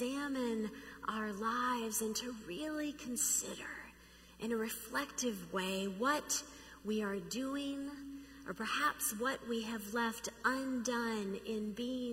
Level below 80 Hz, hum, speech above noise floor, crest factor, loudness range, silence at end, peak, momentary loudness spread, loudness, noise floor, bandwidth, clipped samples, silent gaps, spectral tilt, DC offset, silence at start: -66 dBFS; none; 21 dB; 20 dB; 2 LU; 0 s; -18 dBFS; 10 LU; -38 LUFS; -60 dBFS; 16 kHz; under 0.1%; none; -2.5 dB/octave; under 0.1%; 0 s